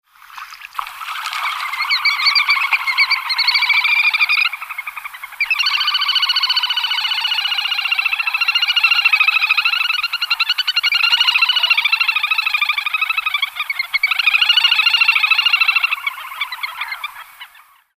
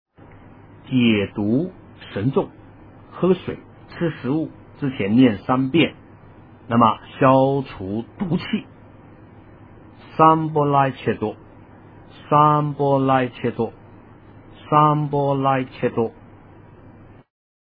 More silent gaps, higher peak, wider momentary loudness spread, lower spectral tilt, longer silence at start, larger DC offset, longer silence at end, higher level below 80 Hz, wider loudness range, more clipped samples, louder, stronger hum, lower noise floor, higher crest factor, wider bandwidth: neither; about the same, -2 dBFS vs -2 dBFS; about the same, 13 LU vs 13 LU; second, 5 dB/octave vs -11 dB/octave; second, 0.3 s vs 0.85 s; neither; second, 0.5 s vs 1.65 s; second, -66 dBFS vs -54 dBFS; about the same, 3 LU vs 4 LU; neither; first, -14 LUFS vs -20 LUFS; neither; about the same, -47 dBFS vs -45 dBFS; about the same, 16 dB vs 20 dB; first, 15.5 kHz vs 4.9 kHz